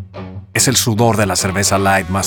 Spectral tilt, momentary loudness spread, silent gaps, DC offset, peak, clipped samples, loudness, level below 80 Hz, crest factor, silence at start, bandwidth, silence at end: -3.5 dB/octave; 11 LU; none; under 0.1%; 0 dBFS; under 0.1%; -14 LUFS; -44 dBFS; 14 dB; 0 s; 17.5 kHz; 0 s